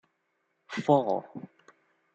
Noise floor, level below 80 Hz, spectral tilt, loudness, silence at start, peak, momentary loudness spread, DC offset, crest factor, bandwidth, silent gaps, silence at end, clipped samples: -77 dBFS; -80 dBFS; -7 dB/octave; -28 LUFS; 0.7 s; -8 dBFS; 21 LU; under 0.1%; 22 dB; 8.4 kHz; none; 0.7 s; under 0.1%